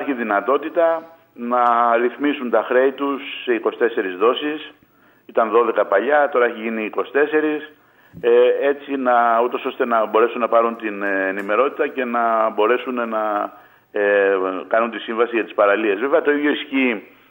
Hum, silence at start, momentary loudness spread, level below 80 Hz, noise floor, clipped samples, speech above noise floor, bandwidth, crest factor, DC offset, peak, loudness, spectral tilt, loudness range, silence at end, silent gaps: none; 0 s; 8 LU; -72 dBFS; -48 dBFS; under 0.1%; 29 dB; 16 kHz; 16 dB; under 0.1%; -2 dBFS; -19 LUFS; -6.5 dB/octave; 2 LU; 0.25 s; none